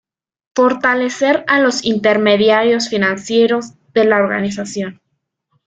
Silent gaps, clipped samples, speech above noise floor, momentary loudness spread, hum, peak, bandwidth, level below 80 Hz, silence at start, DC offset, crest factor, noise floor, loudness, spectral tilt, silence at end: none; under 0.1%; 56 dB; 10 LU; none; -2 dBFS; 9.2 kHz; -58 dBFS; 0.55 s; under 0.1%; 14 dB; -71 dBFS; -15 LUFS; -4.5 dB/octave; 0.75 s